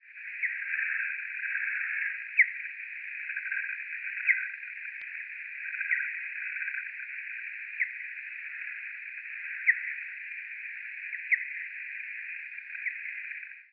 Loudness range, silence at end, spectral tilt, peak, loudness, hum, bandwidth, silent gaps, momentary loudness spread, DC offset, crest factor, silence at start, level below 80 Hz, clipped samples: 5 LU; 0.05 s; 1 dB/octave; -10 dBFS; -32 LUFS; none; 5.2 kHz; none; 11 LU; under 0.1%; 24 dB; 0 s; under -90 dBFS; under 0.1%